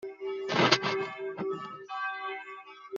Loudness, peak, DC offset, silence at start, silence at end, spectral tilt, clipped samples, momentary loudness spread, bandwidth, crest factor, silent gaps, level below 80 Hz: -31 LUFS; -6 dBFS; under 0.1%; 0 s; 0 s; -2 dB/octave; under 0.1%; 16 LU; 7.6 kHz; 26 dB; none; -74 dBFS